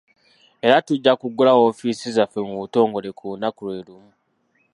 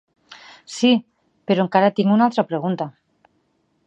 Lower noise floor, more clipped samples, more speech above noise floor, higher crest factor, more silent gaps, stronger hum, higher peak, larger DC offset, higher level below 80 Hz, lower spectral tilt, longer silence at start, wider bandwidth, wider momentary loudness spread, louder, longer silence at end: about the same, -66 dBFS vs -66 dBFS; neither; about the same, 46 dB vs 48 dB; about the same, 20 dB vs 20 dB; neither; neither; about the same, 0 dBFS vs -2 dBFS; neither; about the same, -68 dBFS vs -72 dBFS; about the same, -5.5 dB/octave vs -6 dB/octave; first, 0.65 s vs 0.3 s; first, 11 kHz vs 8.8 kHz; about the same, 15 LU vs 17 LU; about the same, -19 LUFS vs -19 LUFS; about the same, 0.85 s vs 0.95 s